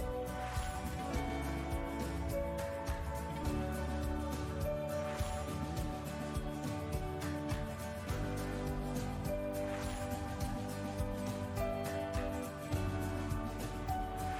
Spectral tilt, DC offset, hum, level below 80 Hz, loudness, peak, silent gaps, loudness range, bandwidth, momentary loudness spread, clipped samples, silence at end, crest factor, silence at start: -6 dB/octave; under 0.1%; none; -44 dBFS; -40 LUFS; -24 dBFS; none; 1 LU; 16 kHz; 2 LU; under 0.1%; 0 s; 14 dB; 0 s